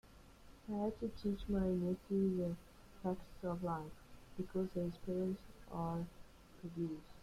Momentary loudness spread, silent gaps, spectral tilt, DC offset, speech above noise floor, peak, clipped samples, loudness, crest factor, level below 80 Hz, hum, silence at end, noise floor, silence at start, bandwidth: 14 LU; none; -8.5 dB/octave; under 0.1%; 20 dB; -26 dBFS; under 0.1%; -42 LUFS; 16 dB; -58 dBFS; none; 0 s; -60 dBFS; 0.05 s; 14.5 kHz